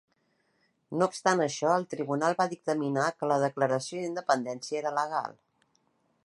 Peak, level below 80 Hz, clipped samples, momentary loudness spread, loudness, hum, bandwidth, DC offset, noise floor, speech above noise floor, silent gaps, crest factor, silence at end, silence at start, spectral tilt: -8 dBFS; -80 dBFS; under 0.1%; 7 LU; -29 LUFS; none; 11.5 kHz; under 0.1%; -73 dBFS; 44 dB; none; 22 dB; 0.95 s; 0.9 s; -5 dB/octave